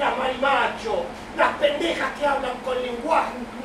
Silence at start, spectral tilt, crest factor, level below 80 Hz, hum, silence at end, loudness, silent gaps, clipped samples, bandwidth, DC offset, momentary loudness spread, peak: 0 s; -3.5 dB/octave; 18 dB; -50 dBFS; none; 0 s; -23 LUFS; none; under 0.1%; 13.5 kHz; under 0.1%; 7 LU; -6 dBFS